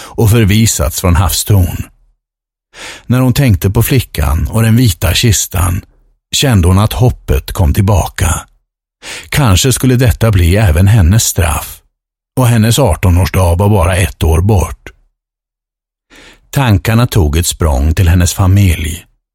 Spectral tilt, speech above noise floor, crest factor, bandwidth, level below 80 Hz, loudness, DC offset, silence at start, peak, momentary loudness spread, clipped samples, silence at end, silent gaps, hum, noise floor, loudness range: -5 dB/octave; 74 dB; 10 dB; 17 kHz; -20 dBFS; -11 LUFS; under 0.1%; 0 s; 0 dBFS; 10 LU; under 0.1%; 0.35 s; none; none; -84 dBFS; 4 LU